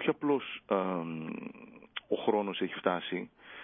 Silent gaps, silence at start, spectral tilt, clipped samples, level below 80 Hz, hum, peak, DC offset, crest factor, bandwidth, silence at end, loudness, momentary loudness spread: none; 0 s; -4 dB/octave; under 0.1%; -76 dBFS; none; -14 dBFS; under 0.1%; 20 dB; 3.8 kHz; 0 s; -33 LUFS; 14 LU